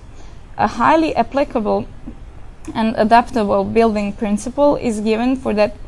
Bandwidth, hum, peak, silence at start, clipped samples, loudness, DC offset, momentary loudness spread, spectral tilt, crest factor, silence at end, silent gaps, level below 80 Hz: 12 kHz; none; 0 dBFS; 0 s; under 0.1%; -17 LUFS; under 0.1%; 14 LU; -6 dB/octave; 16 dB; 0 s; none; -36 dBFS